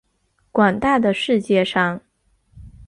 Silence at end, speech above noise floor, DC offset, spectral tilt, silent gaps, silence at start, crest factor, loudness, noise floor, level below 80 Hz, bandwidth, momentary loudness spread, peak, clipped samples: 0.05 s; 48 dB; under 0.1%; -6 dB/octave; none; 0.55 s; 18 dB; -18 LUFS; -65 dBFS; -50 dBFS; 11 kHz; 7 LU; -2 dBFS; under 0.1%